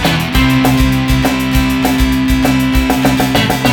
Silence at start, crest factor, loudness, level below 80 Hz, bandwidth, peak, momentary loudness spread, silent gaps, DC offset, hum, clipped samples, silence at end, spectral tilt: 0 s; 12 dB; -12 LUFS; -20 dBFS; 19 kHz; 0 dBFS; 2 LU; none; under 0.1%; none; under 0.1%; 0 s; -5 dB/octave